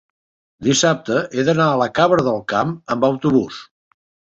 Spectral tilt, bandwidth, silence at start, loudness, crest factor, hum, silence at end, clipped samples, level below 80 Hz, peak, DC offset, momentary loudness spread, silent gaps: -4.5 dB/octave; 8.2 kHz; 0.6 s; -18 LUFS; 16 dB; none; 0.7 s; under 0.1%; -54 dBFS; -2 dBFS; under 0.1%; 7 LU; none